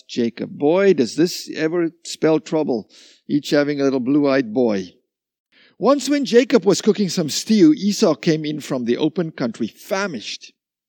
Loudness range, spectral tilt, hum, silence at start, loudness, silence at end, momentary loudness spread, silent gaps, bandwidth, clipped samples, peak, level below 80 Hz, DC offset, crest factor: 3 LU; -5 dB/octave; none; 0.1 s; -19 LUFS; 0.4 s; 10 LU; 5.40-5.45 s; 19 kHz; under 0.1%; -2 dBFS; -76 dBFS; under 0.1%; 18 dB